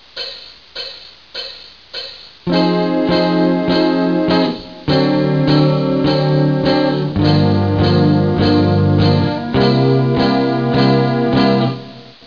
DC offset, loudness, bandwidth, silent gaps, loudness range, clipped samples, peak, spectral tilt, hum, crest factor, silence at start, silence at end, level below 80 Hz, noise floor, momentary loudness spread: 0.4%; -14 LUFS; 5.4 kHz; none; 4 LU; under 0.1%; -2 dBFS; -8.5 dB/octave; none; 12 dB; 0.15 s; 0.15 s; -40 dBFS; -35 dBFS; 14 LU